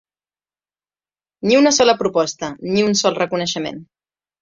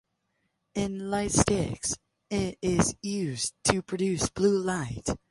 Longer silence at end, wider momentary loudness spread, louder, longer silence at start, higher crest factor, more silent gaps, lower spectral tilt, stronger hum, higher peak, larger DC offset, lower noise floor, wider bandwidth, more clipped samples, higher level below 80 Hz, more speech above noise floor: first, 0.6 s vs 0.15 s; first, 13 LU vs 8 LU; first, -17 LUFS vs -28 LUFS; first, 1.45 s vs 0.75 s; second, 18 dB vs 24 dB; neither; about the same, -3.5 dB/octave vs -4.5 dB/octave; first, 50 Hz at -40 dBFS vs none; about the same, -2 dBFS vs -4 dBFS; neither; first, under -90 dBFS vs -77 dBFS; second, 7.6 kHz vs 11.5 kHz; neither; second, -58 dBFS vs -46 dBFS; first, over 73 dB vs 49 dB